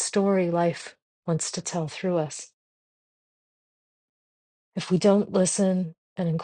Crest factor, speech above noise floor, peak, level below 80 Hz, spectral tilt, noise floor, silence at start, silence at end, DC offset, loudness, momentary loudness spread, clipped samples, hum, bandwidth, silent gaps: 20 dB; over 66 dB; -8 dBFS; -68 dBFS; -5.5 dB/octave; under -90 dBFS; 0 s; 0 s; under 0.1%; -25 LUFS; 17 LU; under 0.1%; none; 10 kHz; 1.02-1.23 s, 2.53-4.72 s, 5.98-6.16 s